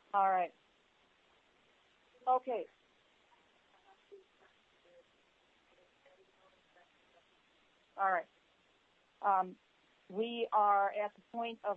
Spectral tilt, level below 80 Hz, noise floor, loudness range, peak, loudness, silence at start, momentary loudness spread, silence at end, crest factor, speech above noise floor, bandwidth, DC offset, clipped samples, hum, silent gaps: -1.5 dB/octave; -90 dBFS; -72 dBFS; 7 LU; -18 dBFS; -35 LUFS; 0.15 s; 13 LU; 0 s; 20 dB; 38 dB; 4.4 kHz; under 0.1%; under 0.1%; none; none